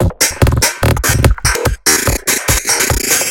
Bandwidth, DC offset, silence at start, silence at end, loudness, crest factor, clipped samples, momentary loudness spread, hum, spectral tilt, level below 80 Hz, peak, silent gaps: 17.5 kHz; under 0.1%; 0 s; 0 s; -12 LUFS; 12 dB; under 0.1%; 2 LU; none; -3 dB/octave; -20 dBFS; 0 dBFS; none